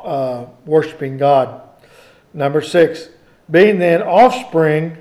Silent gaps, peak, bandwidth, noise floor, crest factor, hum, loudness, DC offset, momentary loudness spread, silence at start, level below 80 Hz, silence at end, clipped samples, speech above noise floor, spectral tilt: none; 0 dBFS; 12.5 kHz; -46 dBFS; 14 dB; none; -14 LUFS; under 0.1%; 12 LU; 0 s; -60 dBFS; 0 s; under 0.1%; 32 dB; -6.5 dB/octave